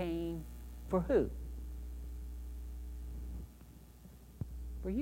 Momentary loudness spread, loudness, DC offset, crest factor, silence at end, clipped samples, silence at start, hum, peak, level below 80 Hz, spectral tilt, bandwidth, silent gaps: 24 LU; -41 LUFS; under 0.1%; 20 dB; 0 s; under 0.1%; 0 s; none; -18 dBFS; -46 dBFS; -8 dB/octave; 16 kHz; none